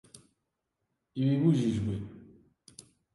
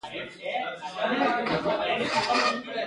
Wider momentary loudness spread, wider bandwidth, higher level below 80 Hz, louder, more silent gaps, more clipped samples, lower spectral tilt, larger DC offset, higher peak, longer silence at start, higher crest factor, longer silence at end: first, 17 LU vs 9 LU; about the same, 11.5 kHz vs 11.5 kHz; about the same, -58 dBFS vs -62 dBFS; about the same, -29 LUFS vs -27 LUFS; neither; neither; first, -8 dB/octave vs -3.5 dB/octave; neither; about the same, -14 dBFS vs -12 dBFS; first, 1.15 s vs 0.05 s; about the same, 18 dB vs 16 dB; first, 0.9 s vs 0 s